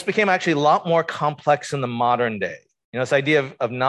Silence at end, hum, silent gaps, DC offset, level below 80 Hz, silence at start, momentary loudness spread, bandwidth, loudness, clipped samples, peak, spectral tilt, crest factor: 0 s; none; 2.84-2.93 s; under 0.1%; -66 dBFS; 0 s; 10 LU; 12 kHz; -21 LUFS; under 0.1%; -6 dBFS; -5.5 dB/octave; 16 dB